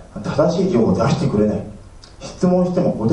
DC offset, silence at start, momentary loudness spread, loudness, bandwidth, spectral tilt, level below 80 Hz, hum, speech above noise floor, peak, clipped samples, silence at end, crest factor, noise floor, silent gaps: under 0.1%; 0 s; 15 LU; -18 LUFS; 9.6 kHz; -7.5 dB/octave; -40 dBFS; none; 21 dB; -2 dBFS; under 0.1%; 0 s; 16 dB; -38 dBFS; none